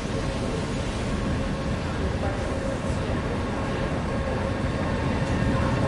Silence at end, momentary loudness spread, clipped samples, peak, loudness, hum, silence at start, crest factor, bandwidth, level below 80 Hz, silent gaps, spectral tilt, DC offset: 0 s; 3 LU; under 0.1%; -12 dBFS; -27 LUFS; none; 0 s; 14 dB; 11.5 kHz; -34 dBFS; none; -6.5 dB/octave; under 0.1%